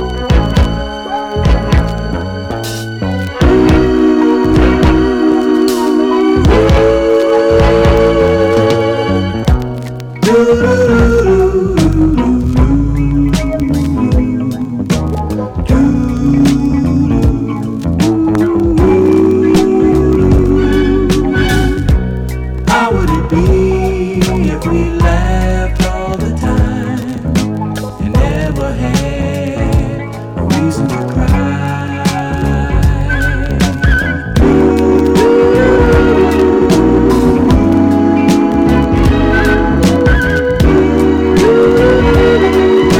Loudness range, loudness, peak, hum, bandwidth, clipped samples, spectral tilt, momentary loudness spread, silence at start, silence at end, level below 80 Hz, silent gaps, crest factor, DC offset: 6 LU; -11 LUFS; -2 dBFS; none; 16.5 kHz; under 0.1%; -7 dB/octave; 8 LU; 0 s; 0 s; -18 dBFS; none; 8 dB; under 0.1%